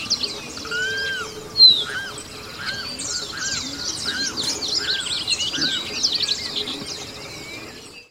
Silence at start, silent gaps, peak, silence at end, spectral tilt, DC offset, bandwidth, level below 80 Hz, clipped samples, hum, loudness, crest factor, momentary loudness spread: 0 s; none; -2 dBFS; 0.05 s; -0.5 dB/octave; under 0.1%; 16 kHz; -54 dBFS; under 0.1%; none; -20 LUFS; 22 dB; 15 LU